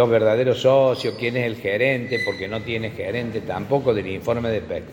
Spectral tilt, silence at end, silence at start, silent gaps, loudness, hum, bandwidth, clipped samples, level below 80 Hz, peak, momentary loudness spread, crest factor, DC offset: -6.5 dB/octave; 0 s; 0 s; none; -22 LUFS; none; 17 kHz; under 0.1%; -52 dBFS; -6 dBFS; 10 LU; 16 dB; under 0.1%